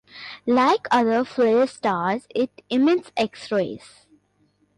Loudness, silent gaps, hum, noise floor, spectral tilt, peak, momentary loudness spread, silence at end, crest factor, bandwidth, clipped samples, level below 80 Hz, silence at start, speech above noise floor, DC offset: -22 LUFS; none; 50 Hz at -55 dBFS; -65 dBFS; -5.5 dB/octave; -8 dBFS; 9 LU; 1 s; 14 dB; 11 kHz; under 0.1%; -64 dBFS; 0.15 s; 43 dB; under 0.1%